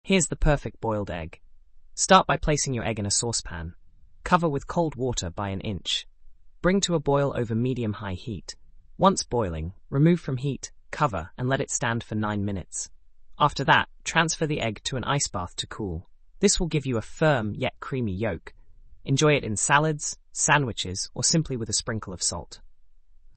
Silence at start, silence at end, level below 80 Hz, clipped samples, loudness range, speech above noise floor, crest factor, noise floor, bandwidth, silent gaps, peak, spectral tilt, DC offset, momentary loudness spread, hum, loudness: 0.05 s; 0.05 s; -42 dBFS; under 0.1%; 3 LU; 24 dB; 20 dB; -49 dBFS; 8.8 kHz; none; -6 dBFS; -4 dB/octave; under 0.1%; 13 LU; none; -25 LUFS